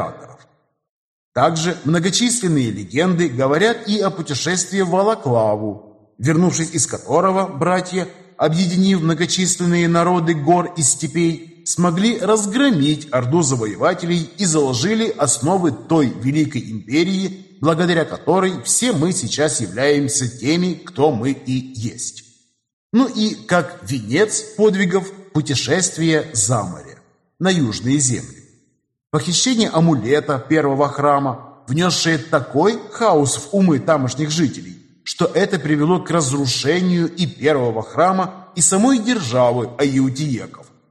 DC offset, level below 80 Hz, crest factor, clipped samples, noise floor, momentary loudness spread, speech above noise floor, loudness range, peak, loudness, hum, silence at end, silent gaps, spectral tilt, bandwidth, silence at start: under 0.1%; -56 dBFS; 18 dB; under 0.1%; -63 dBFS; 8 LU; 46 dB; 3 LU; 0 dBFS; -18 LUFS; none; 0.3 s; 0.89-1.32 s, 22.73-22.90 s; -4.5 dB/octave; 13 kHz; 0 s